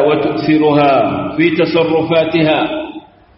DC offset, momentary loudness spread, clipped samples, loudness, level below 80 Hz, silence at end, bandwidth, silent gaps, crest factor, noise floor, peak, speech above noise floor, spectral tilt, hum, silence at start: under 0.1%; 7 LU; under 0.1%; -13 LUFS; -48 dBFS; 0.35 s; 5.8 kHz; none; 12 dB; -33 dBFS; 0 dBFS; 21 dB; -4.5 dB/octave; none; 0 s